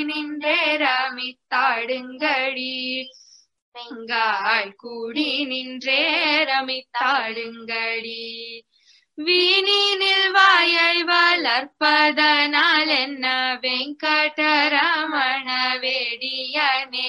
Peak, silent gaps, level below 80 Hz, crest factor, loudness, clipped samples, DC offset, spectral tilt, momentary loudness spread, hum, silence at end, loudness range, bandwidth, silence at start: -2 dBFS; 3.62-3.72 s; -76 dBFS; 20 dB; -19 LUFS; under 0.1%; under 0.1%; -1.5 dB/octave; 12 LU; none; 0 s; 8 LU; 11.5 kHz; 0 s